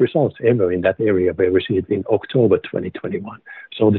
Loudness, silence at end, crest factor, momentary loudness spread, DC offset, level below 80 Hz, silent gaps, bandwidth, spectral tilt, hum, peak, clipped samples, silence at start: -19 LUFS; 0 s; 14 dB; 11 LU; under 0.1%; -54 dBFS; none; 4.2 kHz; -6.5 dB/octave; none; -4 dBFS; under 0.1%; 0 s